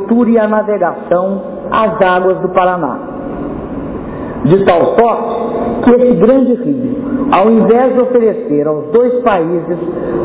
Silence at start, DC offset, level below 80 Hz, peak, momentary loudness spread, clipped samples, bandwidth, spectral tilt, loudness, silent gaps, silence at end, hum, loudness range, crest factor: 0 s; under 0.1%; -40 dBFS; 0 dBFS; 13 LU; under 0.1%; 4 kHz; -11 dB/octave; -12 LUFS; none; 0 s; none; 4 LU; 12 dB